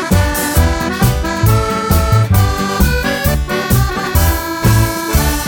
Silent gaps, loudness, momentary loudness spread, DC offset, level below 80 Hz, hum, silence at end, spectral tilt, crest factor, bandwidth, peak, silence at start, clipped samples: none; -14 LUFS; 3 LU; under 0.1%; -18 dBFS; none; 0 s; -5 dB/octave; 12 dB; 17.5 kHz; 0 dBFS; 0 s; under 0.1%